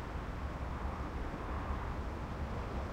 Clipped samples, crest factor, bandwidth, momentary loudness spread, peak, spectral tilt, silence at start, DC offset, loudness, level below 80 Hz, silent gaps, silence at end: under 0.1%; 14 dB; 11 kHz; 2 LU; -26 dBFS; -7 dB/octave; 0 s; under 0.1%; -41 LUFS; -42 dBFS; none; 0 s